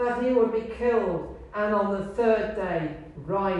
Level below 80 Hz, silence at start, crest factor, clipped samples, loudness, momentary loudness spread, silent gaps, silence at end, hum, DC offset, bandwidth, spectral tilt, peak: -48 dBFS; 0 s; 16 dB; under 0.1%; -26 LUFS; 10 LU; none; 0 s; none; under 0.1%; 9 kHz; -8 dB/octave; -10 dBFS